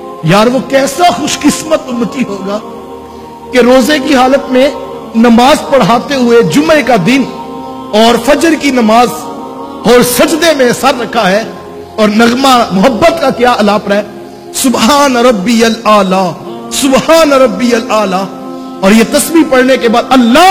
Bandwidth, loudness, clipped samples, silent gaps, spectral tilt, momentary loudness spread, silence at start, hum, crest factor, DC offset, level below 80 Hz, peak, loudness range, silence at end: 19.5 kHz; -8 LUFS; 3%; none; -4 dB/octave; 16 LU; 0 s; none; 8 dB; under 0.1%; -38 dBFS; 0 dBFS; 3 LU; 0 s